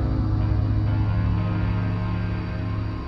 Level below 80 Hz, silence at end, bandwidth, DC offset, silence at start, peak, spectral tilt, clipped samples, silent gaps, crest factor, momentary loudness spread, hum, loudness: -30 dBFS; 0 s; 5.6 kHz; under 0.1%; 0 s; -12 dBFS; -10 dB/octave; under 0.1%; none; 12 dB; 5 LU; none; -25 LUFS